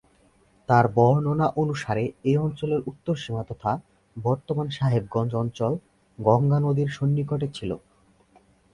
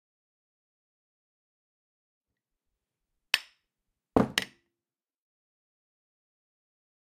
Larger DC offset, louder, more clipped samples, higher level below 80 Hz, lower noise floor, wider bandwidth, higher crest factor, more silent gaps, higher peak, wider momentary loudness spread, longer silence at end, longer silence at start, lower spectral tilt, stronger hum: neither; first, -25 LUFS vs -29 LUFS; neither; first, -54 dBFS vs -62 dBFS; second, -60 dBFS vs under -90 dBFS; second, 10.5 kHz vs 15 kHz; second, 20 dB vs 34 dB; neither; about the same, -4 dBFS vs -4 dBFS; first, 11 LU vs 5 LU; second, 0.95 s vs 2.75 s; second, 0.7 s vs 3.35 s; first, -8 dB/octave vs -4 dB/octave; neither